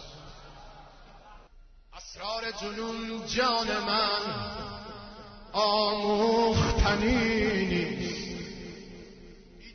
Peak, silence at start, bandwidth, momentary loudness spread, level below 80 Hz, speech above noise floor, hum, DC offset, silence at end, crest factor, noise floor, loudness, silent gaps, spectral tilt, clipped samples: -12 dBFS; 0 s; 6.6 kHz; 22 LU; -42 dBFS; 26 dB; none; under 0.1%; 0 s; 18 dB; -54 dBFS; -28 LUFS; none; -4.5 dB/octave; under 0.1%